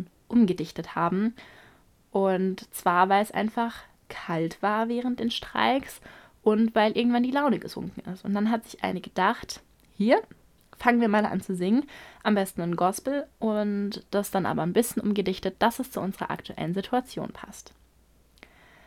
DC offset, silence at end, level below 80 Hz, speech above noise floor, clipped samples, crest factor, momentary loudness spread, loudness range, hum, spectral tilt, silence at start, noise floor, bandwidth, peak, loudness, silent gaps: under 0.1%; 1.25 s; -60 dBFS; 35 dB; under 0.1%; 22 dB; 14 LU; 3 LU; none; -5.5 dB/octave; 0 s; -61 dBFS; 16 kHz; -6 dBFS; -27 LUFS; none